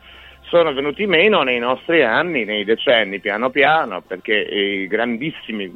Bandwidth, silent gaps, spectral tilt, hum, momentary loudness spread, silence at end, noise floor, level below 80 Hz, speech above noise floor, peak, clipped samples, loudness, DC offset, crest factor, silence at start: 5.6 kHz; none; -6.5 dB/octave; none; 8 LU; 0 s; -41 dBFS; -56 dBFS; 24 dB; -2 dBFS; under 0.1%; -17 LUFS; under 0.1%; 16 dB; 0.05 s